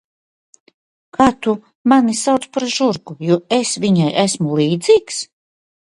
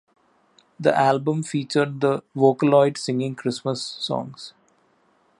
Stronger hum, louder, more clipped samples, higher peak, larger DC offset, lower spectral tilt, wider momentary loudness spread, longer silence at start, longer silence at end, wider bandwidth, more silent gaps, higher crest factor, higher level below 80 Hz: neither; first, -16 LUFS vs -22 LUFS; neither; about the same, 0 dBFS vs -2 dBFS; neither; about the same, -5 dB/octave vs -6 dB/octave; about the same, 9 LU vs 10 LU; first, 1.2 s vs 0.8 s; second, 0.7 s vs 0.9 s; about the same, 11.5 kHz vs 11.5 kHz; first, 1.75-1.85 s vs none; about the same, 18 dB vs 20 dB; first, -54 dBFS vs -72 dBFS